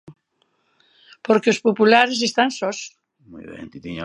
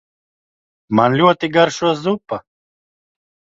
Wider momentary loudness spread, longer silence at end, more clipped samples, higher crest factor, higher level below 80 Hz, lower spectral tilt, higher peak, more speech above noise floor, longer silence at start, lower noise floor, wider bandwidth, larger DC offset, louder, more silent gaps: first, 23 LU vs 12 LU; second, 0 s vs 1 s; neither; about the same, 20 dB vs 18 dB; about the same, -60 dBFS vs -58 dBFS; second, -3.5 dB/octave vs -5.5 dB/octave; about the same, 0 dBFS vs 0 dBFS; second, 49 dB vs over 75 dB; second, 0.1 s vs 0.9 s; second, -68 dBFS vs under -90 dBFS; first, 11 kHz vs 8 kHz; neither; about the same, -18 LUFS vs -16 LUFS; neither